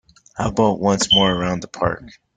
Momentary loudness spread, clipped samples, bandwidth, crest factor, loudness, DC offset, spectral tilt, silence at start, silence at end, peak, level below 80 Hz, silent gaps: 12 LU; under 0.1%; 9.4 kHz; 18 dB; -18 LUFS; under 0.1%; -4 dB/octave; 0.35 s; 0.3 s; -2 dBFS; -44 dBFS; none